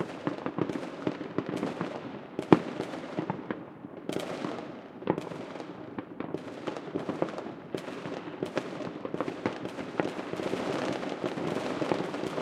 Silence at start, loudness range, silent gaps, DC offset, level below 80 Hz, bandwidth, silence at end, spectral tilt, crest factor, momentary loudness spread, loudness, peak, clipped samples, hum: 0 s; 6 LU; none; under 0.1%; -70 dBFS; 13.5 kHz; 0 s; -6.5 dB/octave; 30 dB; 8 LU; -34 LUFS; -2 dBFS; under 0.1%; none